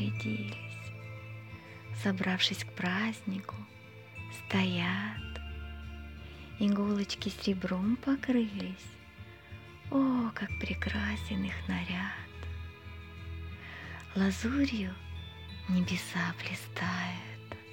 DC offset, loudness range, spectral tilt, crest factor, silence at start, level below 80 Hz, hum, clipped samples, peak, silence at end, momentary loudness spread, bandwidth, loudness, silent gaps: under 0.1%; 4 LU; -5.5 dB/octave; 22 dB; 0 s; -50 dBFS; none; under 0.1%; -14 dBFS; 0 s; 17 LU; 17 kHz; -34 LUFS; none